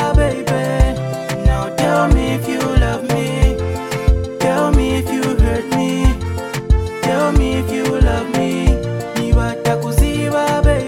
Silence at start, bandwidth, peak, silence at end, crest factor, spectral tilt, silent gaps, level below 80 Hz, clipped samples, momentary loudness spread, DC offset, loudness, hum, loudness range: 0 s; 16 kHz; 0 dBFS; 0 s; 14 dB; -6 dB/octave; none; -18 dBFS; under 0.1%; 4 LU; under 0.1%; -17 LUFS; none; 1 LU